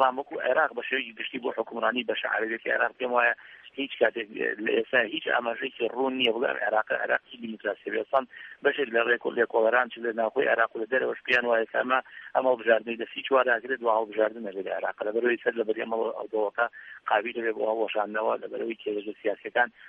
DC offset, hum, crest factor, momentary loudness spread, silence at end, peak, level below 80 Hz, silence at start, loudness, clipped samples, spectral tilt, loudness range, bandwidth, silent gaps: under 0.1%; none; 20 dB; 8 LU; 0 s; -8 dBFS; -80 dBFS; 0 s; -27 LUFS; under 0.1%; -5.5 dB/octave; 3 LU; 6.4 kHz; none